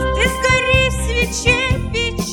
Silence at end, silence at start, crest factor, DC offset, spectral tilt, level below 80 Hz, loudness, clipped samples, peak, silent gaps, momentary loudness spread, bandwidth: 0 s; 0 s; 16 dB; under 0.1%; -4 dB/octave; -24 dBFS; -16 LUFS; under 0.1%; 0 dBFS; none; 6 LU; 18 kHz